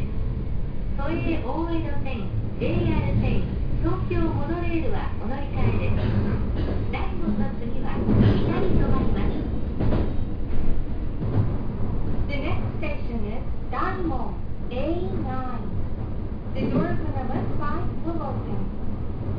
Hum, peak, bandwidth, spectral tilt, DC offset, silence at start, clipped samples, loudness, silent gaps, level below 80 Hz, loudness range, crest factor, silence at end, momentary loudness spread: none; -6 dBFS; 5.2 kHz; -10.5 dB/octave; under 0.1%; 0 s; under 0.1%; -27 LUFS; none; -28 dBFS; 5 LU; 16 dB; 0 s; 8 LU